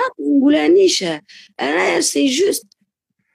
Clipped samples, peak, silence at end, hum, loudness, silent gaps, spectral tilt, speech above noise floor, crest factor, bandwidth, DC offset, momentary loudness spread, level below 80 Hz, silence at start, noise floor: under 0.1%; -4 dBFS; 0.75 s; none; -15 LUFS; none; -2.5 dB/octave; 56 dB; 12 dB; 15.5 kHz; under 0.1%; 12 LU; -64 dBFS; 0 s; -71 dBFS